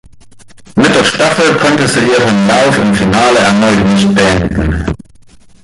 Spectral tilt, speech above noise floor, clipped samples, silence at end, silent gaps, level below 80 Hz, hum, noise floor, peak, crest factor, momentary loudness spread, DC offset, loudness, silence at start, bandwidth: -5 dB/octave; 30 dB; under 0.1%; 0.65 s; none; -28 dBFS; none; -38 dBFS; 0 dBFS; 10 dB; 7 LU; under 0.1%; -9 LUFS; 0.35 s; 11.5 kHz